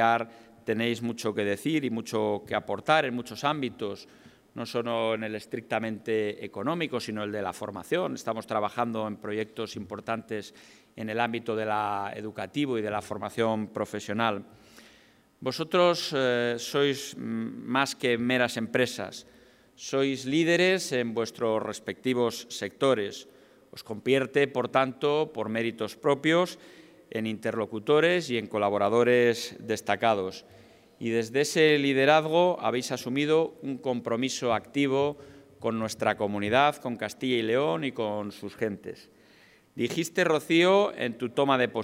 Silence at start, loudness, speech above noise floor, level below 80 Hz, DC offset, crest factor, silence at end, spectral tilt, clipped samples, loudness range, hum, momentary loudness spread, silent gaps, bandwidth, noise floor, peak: 0 s; -28 LUFS; 32 dB; -72 dBFS; under 0.1%; 20 dB; 0 s; -4.5 dB/octave; under 0.1%; 6 LU; none; 13 LU; none; 16 kHz; -60 dBFS; -8 dBFS